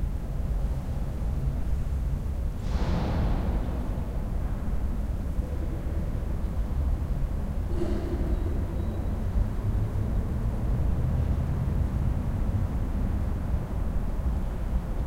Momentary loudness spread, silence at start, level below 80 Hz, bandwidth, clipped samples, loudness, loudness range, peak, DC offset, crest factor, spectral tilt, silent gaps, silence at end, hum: 4 LU; 0 s; -28 dBFS; 15 kHz; under 0.1%; -31 LUFS; 3 LU; -14 dBFS; 0.6%; 12 dB; -8.5 dB/octave; none; 0 s; none